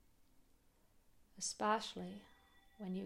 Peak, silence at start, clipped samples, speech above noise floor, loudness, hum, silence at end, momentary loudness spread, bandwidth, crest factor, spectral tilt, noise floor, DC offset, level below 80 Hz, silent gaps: -24 dBFS; 0.35 s; under 0.1%; 30 dB; -42 LUFS; none; 0 s; 14 LU; 16 kHz; 22 dB; -3.5 dB/octave; -71 dBFS; under 0.1%; -74 dBFS; none